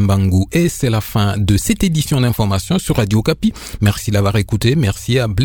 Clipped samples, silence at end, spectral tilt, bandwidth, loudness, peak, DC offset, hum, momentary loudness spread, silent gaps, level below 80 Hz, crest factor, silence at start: under 0.1%; 0 s; -6 dB/octave; 19.5 kHz; -16 LUFS; 0 dBFS; under 0.1%; none; 3 LU; none; -32 dBFS; 14 dB; 0 s